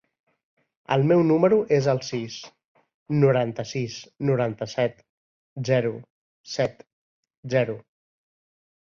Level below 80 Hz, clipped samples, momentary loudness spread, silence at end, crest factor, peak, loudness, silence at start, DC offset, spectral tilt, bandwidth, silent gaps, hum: -64 dBFS; under 0.1%; 15 LU; 1.2 s; 20 dB; -6 dBFS; -24 LUFS; 0.9 s; under 0.1%; -7 dB/octave; 7.4 kHz; 2.64-2.75 s, 2.94-3.06 s, 5.09-5.56 s, 6.10-6.44 s, 6.93-7.23 s, 7.37-7.43 s; none